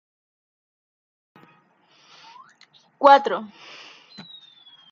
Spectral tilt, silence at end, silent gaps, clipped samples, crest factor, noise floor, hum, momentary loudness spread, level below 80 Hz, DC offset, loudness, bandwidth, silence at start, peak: -4 dB/octave; 1.45 s; none; under 0.1%; 24 dB; -59 dBFS; none; 28 LU; -84 dBFS; under 0.1%; -18 LUFS; 7.2 kHz; 3 s; -2 dBFS